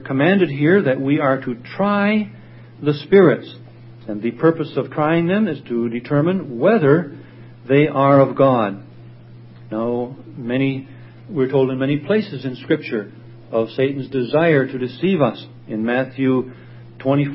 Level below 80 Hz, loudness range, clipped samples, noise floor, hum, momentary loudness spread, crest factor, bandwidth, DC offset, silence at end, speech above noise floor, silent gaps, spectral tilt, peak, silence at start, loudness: -60 dBFS; 5 LU; under 0.1%; -40 dBFS; none; 15 LU; 18 dB; 5.8 kHz; under 0.1%; 0 s; 23 dB; none; -12.5 dB/octave; 0 dBFS; 0 s; -18 LUFS